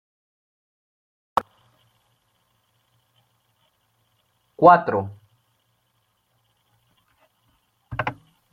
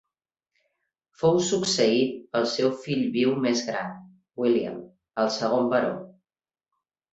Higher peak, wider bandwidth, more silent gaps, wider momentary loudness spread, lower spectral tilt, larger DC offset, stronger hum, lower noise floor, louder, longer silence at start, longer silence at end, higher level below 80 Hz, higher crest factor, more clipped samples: first, 0 dBFS vs -8 dBFS; first, 12 kHz vs 8.2 kHz; neither; first, 18 LU vs 13 LU; first, -7.5 dB/octave vs -4.5 dB/octave; neither; neither; second, -70 dBFS vs under -90 dBFS; first, -20 LUFS vs -25 LUFS; first, 1.35 s vs 1.2 s; second, 0.4 s vs 1 s; first, -60 dBFS vs -68 dBFS; first, 26 dB vs 18 dB; neither